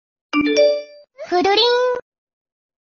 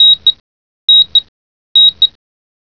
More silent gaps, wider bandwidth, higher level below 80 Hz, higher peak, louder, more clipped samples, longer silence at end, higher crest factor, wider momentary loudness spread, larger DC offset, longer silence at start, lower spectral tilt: second, none vs 0.40-0.88 s, 1.28-1.75 s; first, 7 kHz vs 5.4 kHz; about the same, -58 dBFS vs -54 dBFS; about the same, -2 dBFS vs 0 dBFS; second, -17 LUFS vs -7 LUFS; neither; first, 0.8 s vs 0.55 s; about the same, 16 dB vs 12 dB; first, 12 LU vs 7 LU; second, under 0.1% vs 0.5%; first, 0.35 s vs 0 s; about the same, 0 dB/octave vs 0 dB/octave